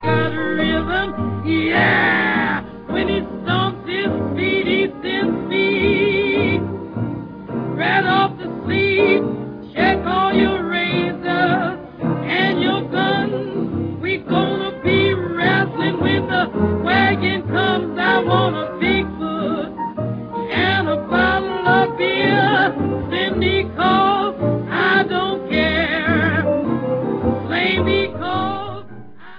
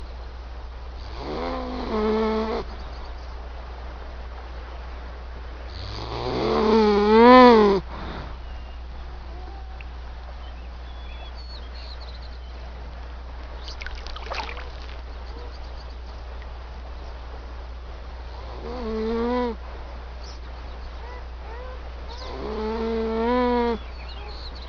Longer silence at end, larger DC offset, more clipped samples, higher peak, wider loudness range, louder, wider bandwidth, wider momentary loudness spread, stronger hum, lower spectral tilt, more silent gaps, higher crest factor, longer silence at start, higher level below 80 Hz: about the same, 0 s vs 0 s; neither; neither; about the same, -2 dBFS vs -2 dBFS; second, 2 LU vs 20 LU; first, -18 LUFS vs -21 LUFS; second, 5.2 kHz vs 6.8 kHz; second, 8 LU vs 18 LU; neither; first, -8.5 dB/octave vs -4.5 dB/octave; neither; second, 16 dB vs 24 dB; about the same, 0 s vs 0 s; second, -42 dBFS vs -36 dBFS